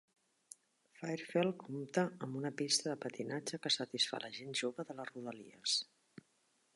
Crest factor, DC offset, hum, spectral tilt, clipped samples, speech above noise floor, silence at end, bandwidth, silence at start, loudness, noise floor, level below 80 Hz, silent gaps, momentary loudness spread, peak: 22 dB; under 0.1%; none; -3 dB/octave; under 0.1%; 37 dB; 0.55 s; 11.5 kHz; 1 s; -38 LUFS; -77 dBFS; -88 dBFS; none; 14 LU; -18 dBFS